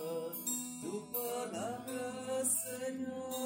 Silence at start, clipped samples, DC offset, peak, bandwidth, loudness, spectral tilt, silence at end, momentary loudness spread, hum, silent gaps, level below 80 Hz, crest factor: 0 s; under 0.1%; under 0.1%; -20 dBFS; 16 kHz; -38 LUFS; -3 dB/octave; 0 s; 8 LU; none; none; -80 dBFS; 18 dB